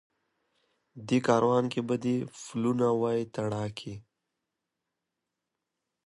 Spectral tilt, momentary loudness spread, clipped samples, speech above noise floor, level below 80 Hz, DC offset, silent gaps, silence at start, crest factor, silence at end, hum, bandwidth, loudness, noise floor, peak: -6.5 dB/octave; 16 LU; under 0.1%; 57 dB; -68 dBFS; under 0.1%; none; 0.95 s; 22 dB; 2.05 s; none; 11.5 kHz; -29 LUFS; -86 dBFS; -10 dBFS